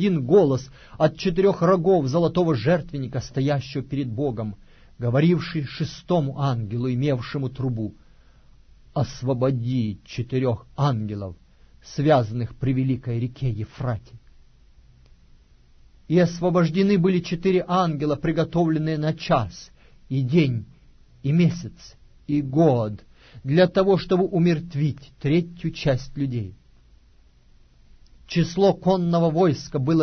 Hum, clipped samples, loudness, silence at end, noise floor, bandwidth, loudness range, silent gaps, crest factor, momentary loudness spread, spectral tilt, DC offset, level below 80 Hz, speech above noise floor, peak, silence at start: none; under 0.1%; -23 LUFS; 0 s; -54 dBFS; 6.6 kHz; 6 LU; none; 16 dB; 12 LU; -8 dB/octave; under 0.1%; -48 dBFS; 32 dB; -6 dBFS; 0 s